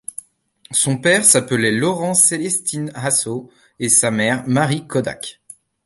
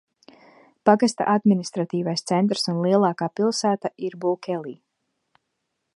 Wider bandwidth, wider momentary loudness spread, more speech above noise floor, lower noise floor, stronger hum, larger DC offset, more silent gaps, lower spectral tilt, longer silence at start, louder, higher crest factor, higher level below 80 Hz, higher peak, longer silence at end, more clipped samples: about the same, 12 kHz vs 11.5 kHz; first, 14 LU vs 8 LU; second, 34 dB vs 56 dB; second, -52 dBFS vs -78 dBFS; neither; neither; neither; second, -3 dB/octave vs -5.5 dB/octave; second, 0.7 s vs 0.85 s; first, -16 LUFS vs -22 LUFS; about the same, 18 dB vs 22 dB; first, -58 dBFS vs -74 dBFS; about the same, 0 dBFS vs -2 dBFS; second, 0.55 s vs 1.2 s; neither